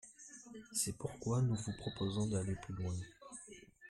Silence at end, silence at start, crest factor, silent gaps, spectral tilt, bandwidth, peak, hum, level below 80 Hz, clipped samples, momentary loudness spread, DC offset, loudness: 0 s; 0.05 s; 18 dB; none; -5 dB/octave; 14 kHz; -22 dBFS; none; -62 dBFS; under 0.1%; 17 LU; under 0.1%; -39 LUFS